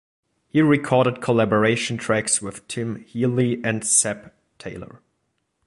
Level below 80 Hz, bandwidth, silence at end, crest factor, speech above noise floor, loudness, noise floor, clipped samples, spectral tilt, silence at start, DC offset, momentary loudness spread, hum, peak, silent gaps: -58 dBFS; 11.5 kHz; 0.7 s; 18 dB; 52 dB; -21 LUFS; -73 dBFS; under 0.1%; -4.5 dB/octave; 0.55 s; under 0.1%; 17 LU; none; -4 dBFS; none